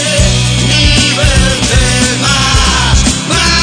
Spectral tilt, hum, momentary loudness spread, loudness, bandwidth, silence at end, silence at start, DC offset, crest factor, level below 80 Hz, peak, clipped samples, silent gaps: -3 dB/octave; none; 2 LU; -8 LUFS; 10 kHz; 0 s; 0 s; under 0.1%; 8 dB; -16 dBFS; 0 dBFS; 0.3%; none